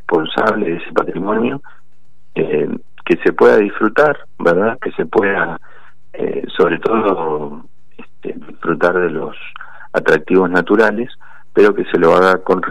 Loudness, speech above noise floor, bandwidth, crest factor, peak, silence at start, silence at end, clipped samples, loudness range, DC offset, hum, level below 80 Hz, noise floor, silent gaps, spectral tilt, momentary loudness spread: -15 LUFS; 44 dB; 10 kHz; 14 dB; -2 dBFS; 0.1 s; 0 s; under 0.1%; 5 LU; 4%; none; -56 dBFS; -59 dBFS; none; -7 dB/octave; 16 LU